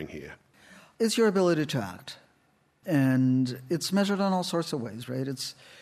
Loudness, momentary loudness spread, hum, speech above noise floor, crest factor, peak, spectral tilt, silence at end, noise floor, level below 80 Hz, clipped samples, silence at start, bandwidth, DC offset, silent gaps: -27 LUFS; 20 LU; none; 40 dB; 14 dB; -14 dBFS; -5.5 dB/octave; 0 s; -67 dBFS; -70 dBFS; under 0.1%; 0 s; 14.5 kHz; under 0.1%; none